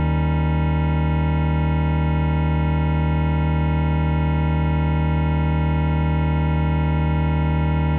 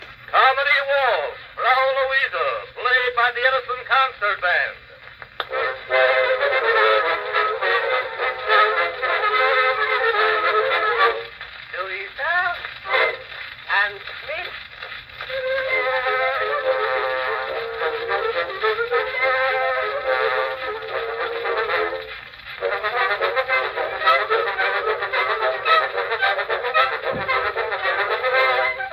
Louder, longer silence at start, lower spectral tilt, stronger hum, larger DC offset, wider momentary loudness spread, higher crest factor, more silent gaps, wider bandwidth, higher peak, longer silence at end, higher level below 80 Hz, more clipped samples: about the same, -20 LUFS vs -20 LUFS; about the same, 0 s vs 0 s; first, -8 dB/octave vs -4 dB/octave; neither; neither; second, 0 LU vs 11 LU; second, 10 dB vs 18 dB; neither; second, 4 kHz vs 13.5 kHz; second, -10 dBFS vs -2 dBFS; about the same, 0 s vs 0 s; first, -24 dBFS vs -56 dBFS; neither